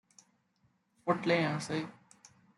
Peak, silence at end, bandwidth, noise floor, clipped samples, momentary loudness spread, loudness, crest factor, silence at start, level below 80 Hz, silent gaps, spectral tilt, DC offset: -14 dBFS; 0.65 s; 11.5 kHz; -74 dBFS; under 0.1%; 11 LU; -33 LUFS; 22 dB; 1.05 s; -78 dBFS; none; -5.5 dB/octave; under 0.1%